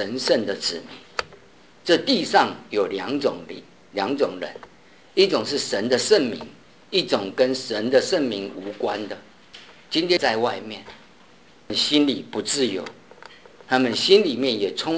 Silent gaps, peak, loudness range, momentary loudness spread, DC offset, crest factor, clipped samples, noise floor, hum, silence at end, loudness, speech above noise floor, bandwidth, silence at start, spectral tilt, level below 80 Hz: none; -2 dBFS; 4 LU; 16 LU; 0.2%; 22 dB; under 0.1%; -52 dBFS; none; 0 s; -22 LUFS; 30 dB; 8 kHz; 0 s; -3.5 dB/octave; -64 dBFS